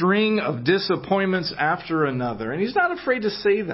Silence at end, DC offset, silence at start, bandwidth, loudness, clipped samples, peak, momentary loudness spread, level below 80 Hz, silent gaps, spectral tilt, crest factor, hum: 0 s; under 0.1%; 0 s; 5.8 kHz; -22 LUFS; under 0.1%; -8 dBFS; 3 LU; -58 dBFS; none; -9.5 dB/octave; 14 dB; none